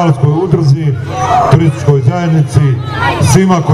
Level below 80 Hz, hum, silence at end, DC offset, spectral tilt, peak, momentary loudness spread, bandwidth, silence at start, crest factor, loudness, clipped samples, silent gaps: -34 dBFS; none; 0 s; 0.4%; -6.5 dB/octave; 0 dBFS; 5 LU; 12.5 kHz; 0 s; 10 dB; -10 LUFS; 0.4%; none